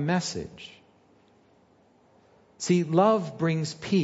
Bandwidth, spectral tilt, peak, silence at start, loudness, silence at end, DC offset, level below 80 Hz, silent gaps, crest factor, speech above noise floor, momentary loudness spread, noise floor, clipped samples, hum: 8 kHz; -6 dB/octave; -8 dBFS; 0 s; -26 LUFS; 0 s; under 0.1%; -64 dBFS; none; 18 dB; 36 dB; 20 LU; -61 dBFS; under 0.1%; none